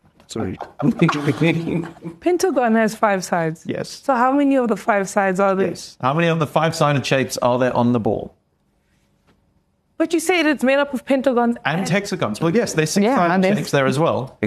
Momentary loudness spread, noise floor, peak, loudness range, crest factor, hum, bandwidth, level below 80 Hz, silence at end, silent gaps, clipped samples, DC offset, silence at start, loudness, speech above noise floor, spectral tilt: 8 LU; -64 dBFS; -2 dBFS; 3 LU; 18 dB; none; 13 kHz; -56 dBFS; 0 s; none; under 0.1%; under 0.1%; 0.3 s; -19 LUFS; 46 dB; -5.5 dB/octave